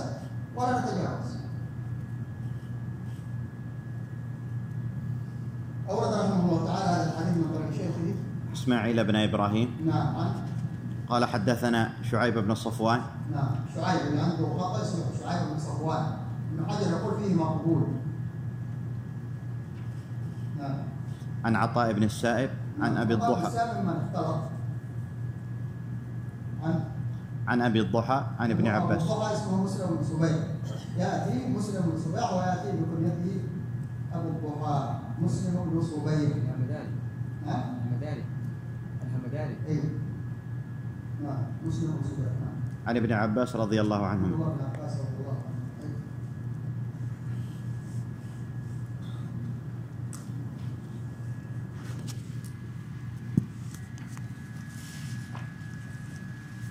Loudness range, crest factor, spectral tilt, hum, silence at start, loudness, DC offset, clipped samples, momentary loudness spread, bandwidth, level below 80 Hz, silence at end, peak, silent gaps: 9 LU; 22 dB; -7 dB/octave; none; 0 s; -31 LUFS; under 0.1%; under 0.1%; 12 LU; 15 kHz; -58 dBFS; 0 s; -8 dBFS; none